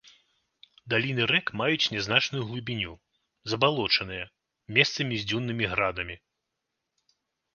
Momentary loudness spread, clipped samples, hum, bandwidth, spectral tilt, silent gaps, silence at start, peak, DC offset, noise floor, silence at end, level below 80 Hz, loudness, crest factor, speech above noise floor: 12 LU; under 0.1%; none; 7.2 kHz; -4.5 dB/octave; none; 0.85 s; -4 dBFS; under 0.1%; -83 dBFS; 1.4 s; -58 dBFS; -26 LUFS; 26 dB; 56 dB